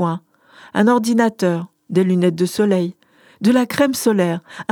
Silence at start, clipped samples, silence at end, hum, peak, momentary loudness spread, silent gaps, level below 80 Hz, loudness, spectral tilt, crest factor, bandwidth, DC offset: 0 s; under 0.1%; 0.1 s; none; -2 dBFS; 10 LU; none; -64 dBFS; -18 LUFS; -6 dB/octave; 16 dB; 20 kHz; under 0.1%